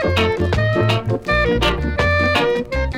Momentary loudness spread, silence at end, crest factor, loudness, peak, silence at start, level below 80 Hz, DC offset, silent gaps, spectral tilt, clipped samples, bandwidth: 3 LU; 0 s; 14 dB; -17 LUFS; -2 dBFS; 0 s; -28 dBFS; under 0.1%; none; -6 dB/octave; under 0.1%; 15 kHz